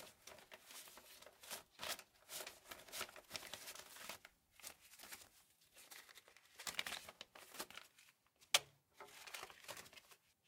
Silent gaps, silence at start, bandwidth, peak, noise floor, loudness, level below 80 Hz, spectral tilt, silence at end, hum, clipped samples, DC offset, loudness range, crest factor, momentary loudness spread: none; 0 s; 17 kHz; -16 dBFS; -73 dBFS; -49 LUFS; -84 dBFS; 0.5 dB/octave; 0.15 s; none; under 0.1%; under 0.1%; 8 LU; 36 dB; 18 LU